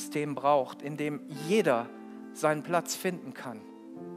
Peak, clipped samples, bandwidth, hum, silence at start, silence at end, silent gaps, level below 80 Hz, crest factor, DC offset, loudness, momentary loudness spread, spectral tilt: -12 dBFS; under 0.1%; 16 kHz; none; 0 s; 0 s; none; -86 dBFS; 20 dB; under 0.1%; -30 LUFS; 18 LU; -4.5 dB/octave